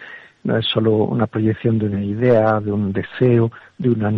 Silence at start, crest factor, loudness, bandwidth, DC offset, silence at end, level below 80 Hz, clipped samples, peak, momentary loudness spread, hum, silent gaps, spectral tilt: 0 s; 14 dB; -18 LUFS; 4.9 kHz; under 0.1%; 0 s; -52 dBFS; under 0.1%; -4 dBFS; 8 LU; none; none; -9.5 dB/octave